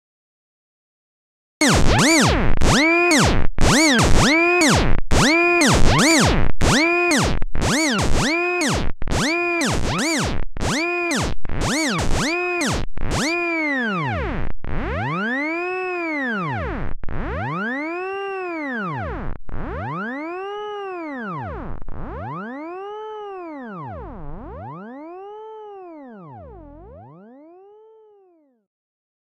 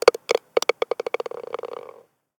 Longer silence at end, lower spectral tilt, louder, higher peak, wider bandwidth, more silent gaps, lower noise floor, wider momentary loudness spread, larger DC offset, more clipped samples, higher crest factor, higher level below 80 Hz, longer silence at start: first, 2.1 s vs 0.5 s; first, -4 dB/octave vs -1.5 dB/octave; first, -19 LUFS vs -25 LUFS; about the same, 0 dBFS vs 0 dBFS; second, 14 kHz vs 19.5 kHz; neither; first, -56 dBFS vs -48 dBFS; first, 21 LU vs 16 LU; neither; neither; second, 18 dB vs 24 dB; first, -26 dBFS vs -70 dBFS; first, 1.6 s vs 0.05 s